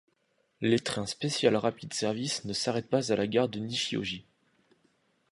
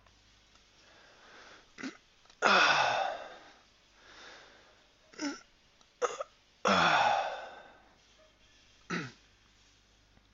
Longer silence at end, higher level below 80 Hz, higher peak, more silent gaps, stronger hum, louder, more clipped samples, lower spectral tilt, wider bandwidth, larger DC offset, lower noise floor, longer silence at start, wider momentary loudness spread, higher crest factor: second, 1.1 s vs 1.25 s; about the same, -66 dBFS vs -70 dBFS; about the same, -10 dBFS vs -8 dBFS; neither; neither; about the same, -30 LUFS vs -30 LUFS; neither; first, -4.5 dB/octave vs -0.5 dB/octave; first, 11.5 kHz vs 8 kHz; neither; first, -73 dBFS vs -65 dBFS; second, 0.6 s vs 1.4 s; second, 7 LU vs 28 LU; second, 22 dB vs 28 dB